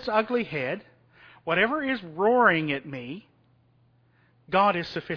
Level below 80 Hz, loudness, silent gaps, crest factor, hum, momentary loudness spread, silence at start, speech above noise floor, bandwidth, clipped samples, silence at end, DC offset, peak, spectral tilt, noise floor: -64 dBFS; -25 LUFS; none; 20 dB; none; 17 LU; 0 s; 38 dB; 5.4 kHz; under 0.1%; 0 s; under 0.1%; -6 dBFS; -7 dB/octave; -63 dBFS